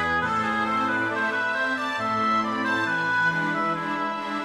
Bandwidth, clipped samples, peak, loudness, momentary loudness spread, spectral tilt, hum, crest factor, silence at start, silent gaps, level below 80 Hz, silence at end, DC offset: 14.5 kHz; under 0.1%; -14 dBFS; -24 LUFS; 4 LU; -4.5 dB/octave; none; 12 dB; 0 s; none; -58 dBFS; 0 s; under 0.1%